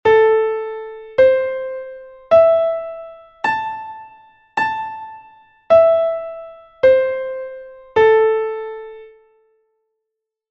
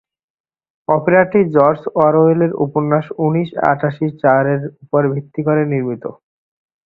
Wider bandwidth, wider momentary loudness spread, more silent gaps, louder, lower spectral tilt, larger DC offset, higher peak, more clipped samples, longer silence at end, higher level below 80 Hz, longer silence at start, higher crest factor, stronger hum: first, 6.8 kHz vs 4.6 kHz; first, 22 LU vs 8 LU; neither; about the same, -16 LUFS vs -15 LUFS; second, -5 dB/octave vs -11 dB/octave; neither; about the same, -2 dBFS vs 0 dBFS; neither; first, 1.45 s vs 0.75 s; about the same, -56 dBFS vs -56 dBFS; second, 0.05 s vs 0.9 s; about the same, 16 dB vs 16 dB; neither